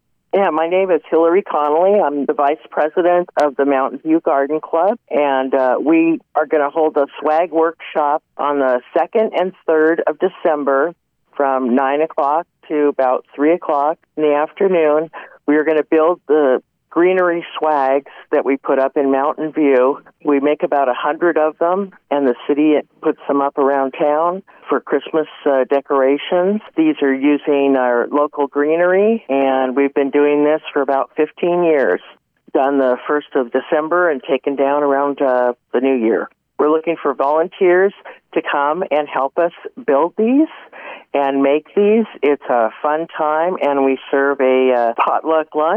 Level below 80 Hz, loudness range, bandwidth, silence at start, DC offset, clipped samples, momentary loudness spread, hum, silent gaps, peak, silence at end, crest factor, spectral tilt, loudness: -74 dBFS; 2 LU; 5.4 kHz; 0.35 s; under 0.1%; under 0.1%; 5 LU; none; none; -4 dBFS; 0 s; 10 dB; -7.5 dB/octave; -16 LUFS